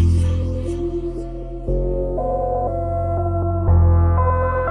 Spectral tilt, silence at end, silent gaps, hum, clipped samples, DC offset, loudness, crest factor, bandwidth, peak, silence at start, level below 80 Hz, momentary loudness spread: -9.5 dB/octave; 0 s; none; none; under 0.1%; under 0.1%; -20 LUFS; 12 dB; 9 kHz; -6 dBFS; 0 s; -24 dBFS; 10 LU